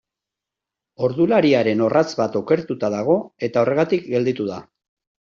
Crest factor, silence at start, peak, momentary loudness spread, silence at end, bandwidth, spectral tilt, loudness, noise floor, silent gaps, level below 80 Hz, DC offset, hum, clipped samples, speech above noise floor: 16 dB; 1 s; -4 dBFS; 8 LU; 0.65 s; 7.4 kHz; -5.5 dB/octave; -20 LUFS; -86 dBFS; none; -62 dBFS; under 0.1%; none; under 0.1%; 67 dB